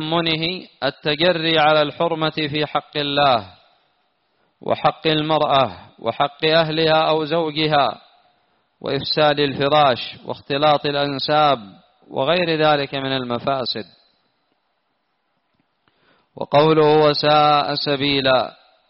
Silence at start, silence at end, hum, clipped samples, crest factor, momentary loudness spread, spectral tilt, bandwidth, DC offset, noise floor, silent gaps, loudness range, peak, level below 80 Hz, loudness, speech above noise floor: 0 s; 0.4 s; none; under 0.1%; 16 dB; 10 LU; -2.5 dB/octave; 5.8 kHz; under 0.1%; -70 dBFS; none; 4 LU; -4 dBFS; -56 dBFS; -18 LUFS; 52 dB